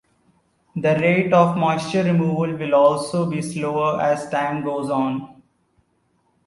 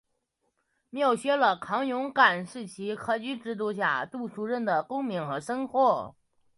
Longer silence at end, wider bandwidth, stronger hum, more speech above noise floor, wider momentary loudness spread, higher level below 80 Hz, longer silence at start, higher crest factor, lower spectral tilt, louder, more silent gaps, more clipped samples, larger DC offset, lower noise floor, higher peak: first, 1.15 s vs 0.45 s; about the same, 11.5 kHz vs 11.5 kHz; neither; second, 46 dB vs 50 dB; second, 8 LU vs 13 LU; first, -60 dBFS vs -72 dBFS; second, 0.75 s vs 0.95 s; about the same, 20 dB vs 20 dB; first, -7 dB/octave vs -5 dB/octave; first, -20 LUFS vs -28 LUFS; neither; neither; neither; second, -65 dBFS vs -77 dBFS; first, -2 dBFS vs -8 dBFS